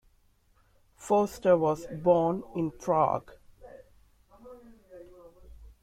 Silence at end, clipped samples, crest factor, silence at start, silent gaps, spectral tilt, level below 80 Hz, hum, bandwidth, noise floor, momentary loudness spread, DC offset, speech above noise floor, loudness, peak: 0.2 s; under 0.1%; 20 dB; 1 s; none; -7 dB/octave; -58 dBFS; none; 15 kHz; -65 dBFS; 10 LU; under 0.1%; 39 dB; -27 LUFS; -12 dBFS